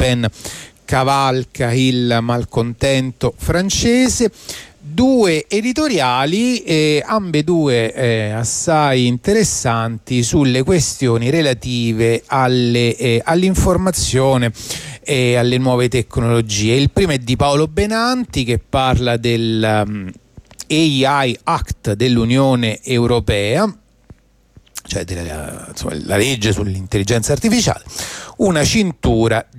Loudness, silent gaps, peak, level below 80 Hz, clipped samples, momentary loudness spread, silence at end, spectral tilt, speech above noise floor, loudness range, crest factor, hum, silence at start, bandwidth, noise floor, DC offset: -16 LUFS; none; -4 dBFS; -34 dBFS; under 0.1%; 10 LU; 0 s; -5 dB/octave; 33 dB; 3 LU; 12 dB; none; 0 s; 15.5 kHz; -49 dBFS; under 0.1%